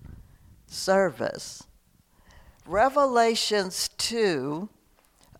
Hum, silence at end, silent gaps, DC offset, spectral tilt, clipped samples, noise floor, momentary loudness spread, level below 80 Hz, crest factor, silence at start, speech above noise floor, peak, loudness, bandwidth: none; 0.75 s; none; under 0.1%; -3 dB/octave; under 0.1%; -61 dBFS; 17 LU; -56 dBFS; 18 dB; 0.05 s; 36 dB; -8 dBFS; -25 LUFS; 16.5 kHz